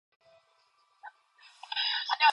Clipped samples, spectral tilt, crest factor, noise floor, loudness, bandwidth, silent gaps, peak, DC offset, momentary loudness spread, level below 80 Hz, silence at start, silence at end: under 0.1%; 2.5 dB/octave; 22 dB; -69 dBFS; -29 LUFS; 10.5 kHz; none; -10 dBFS; under 0.1%; 25 LU; under -90 dBFS; 1.05 s; 0 s